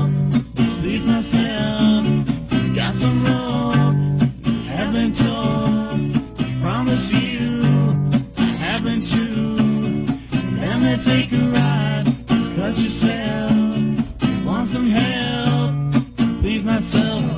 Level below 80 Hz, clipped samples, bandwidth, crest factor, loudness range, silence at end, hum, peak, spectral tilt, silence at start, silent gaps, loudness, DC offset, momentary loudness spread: -38 dBFS; under 0.1%; 4 kHz; 14 dB; 1 LU; 0 s; none; -4 dBFS; -11.5 dB/octave; 0 s; none; -19 LUFS; under 0.1%; 4 LU